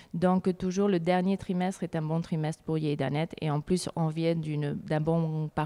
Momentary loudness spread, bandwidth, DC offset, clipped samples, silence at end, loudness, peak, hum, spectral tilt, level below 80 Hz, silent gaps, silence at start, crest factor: 6 LU; 12 kHz; under 0.1%; under 0.1%; 0 s; -29 LUFS; -12 dBFS; none; -7 dB/octave; -58 dBFS; none; 0 s; 16 dB